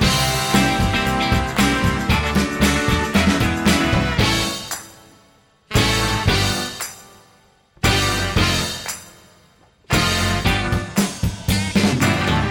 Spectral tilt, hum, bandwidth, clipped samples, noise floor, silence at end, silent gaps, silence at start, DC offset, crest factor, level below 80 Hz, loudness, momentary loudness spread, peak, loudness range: -4 dB/octave; none; 19 kHz; under 0.1%; -54 dBFS; 0 s; none; 0 s; under 0.1%; 14 dB; -30 dBFS; -18 LUFS; 7 LU; -4 dBFS; 4 LU